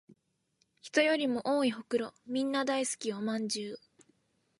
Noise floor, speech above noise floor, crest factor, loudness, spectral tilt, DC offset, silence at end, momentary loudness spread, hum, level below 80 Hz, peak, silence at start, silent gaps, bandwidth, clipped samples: -76 dBFS; 45 dB; 20 dB; -32 LUFS; -3 dB/octave; under 0.1%; 0.8 s; 9 LU; none; -82 dBFS; -14 dBFS; 0.85 s; none; 11.5 kHz; under 0.1%